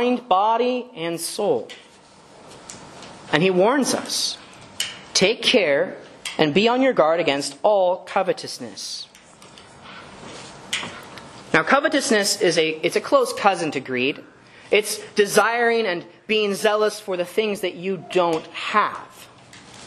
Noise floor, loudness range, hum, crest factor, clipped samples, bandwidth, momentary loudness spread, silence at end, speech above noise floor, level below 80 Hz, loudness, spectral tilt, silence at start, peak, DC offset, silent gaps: -49 dBFS; 5 LU; none; 22 dB; under 0.1%; 13 kHz; 21 LU; 0 s; 28 dB; -64 dBFS; -21 LUFS; -3 dB/octave; 0 s; 0 dBFS; under 0.1%; none